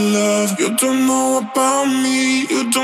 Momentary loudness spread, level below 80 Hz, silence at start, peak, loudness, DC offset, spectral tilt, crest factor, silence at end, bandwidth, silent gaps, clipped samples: 2 LU; -84 dBFS; 0 s; -4 dBFS; -16 LUFS; under 0.1%; -3 dB/octave; 14 dB; 0 s; 16 kHz; none; under 0.1%